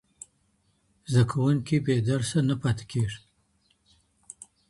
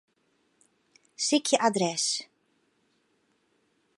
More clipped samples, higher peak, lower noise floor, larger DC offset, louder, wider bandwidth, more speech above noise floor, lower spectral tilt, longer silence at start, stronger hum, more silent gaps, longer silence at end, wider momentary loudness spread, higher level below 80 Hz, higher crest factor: neither; about the same, -10 dBFS vs -8 dBFS; about the same, -69 dBFS vs -71 dBFS; neither; about the same, -26 LUFS vs -26 LUFS; about the same, 11.5 kHz vs 11.5 kHz; about the same, 44 dB vs 45 dB; first, -6.5 dB/octave vs -2.5 dB/octave; about the same, 1.1 s vs 1.2 s; neither; neither; second, 1.55 s vs 1.75 s; first, 24 LU vs 7 LU; first, -54 dBFS vs -84 dBFS; second, 18 dB vs 24 dB